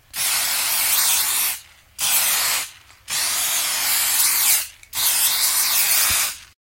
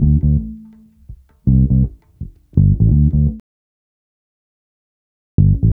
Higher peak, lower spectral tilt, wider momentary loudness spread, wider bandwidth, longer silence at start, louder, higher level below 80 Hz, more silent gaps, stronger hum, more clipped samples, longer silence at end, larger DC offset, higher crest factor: about the same, -2 dBFS vs 0 dBFS; second, 2.5 dB/octave vs -15 dB/octave; second, 8 LU vs 21 LU; first, 16.5 kHz vs 1 kHz; first, 0.15 s vs 0 s; about the same, -17 LUFS vs -15 LUFS; second, -56 dBFS vs -22 dBFS; second, none vs 3.40-5.38 s; neither; neither; first, 0.2 s vs 0 s; neither; about the same, 18 dB vs 16 dB